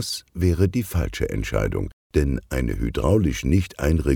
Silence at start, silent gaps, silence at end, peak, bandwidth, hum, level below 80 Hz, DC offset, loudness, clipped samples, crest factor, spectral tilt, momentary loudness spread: 0 s; 1.93-2.10 s; 0 s; -6 dBFS; 18.5 kHz; none; -30 dBFS; under 0.1%; -23 LUFS; under 0.1%; 16 dB; -6.5 dB/octave; 6 LU